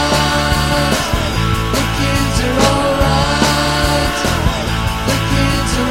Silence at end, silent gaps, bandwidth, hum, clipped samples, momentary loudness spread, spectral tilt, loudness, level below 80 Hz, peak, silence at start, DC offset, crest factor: 0 s; none; 16.5 kHz; none; under 0.1%; 3 LU; -4.5 dB/octave; -15 LUFS; -22 dBFS; 0 dBFS; 0 s; 1%; 14 dB